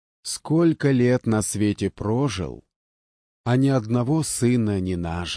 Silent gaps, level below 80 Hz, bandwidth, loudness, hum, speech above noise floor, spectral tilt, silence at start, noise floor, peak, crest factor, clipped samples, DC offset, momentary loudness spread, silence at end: 2.76-3.44 s; -48 dBFS; 11 kHz; -22 LUFS; none; over 68 dB; -6 dB/octave; 0.25 s; under -90 dBFS; -8 dBFS; 14 dB; under 0.1%; under 0.1%; 10 LU; 0 s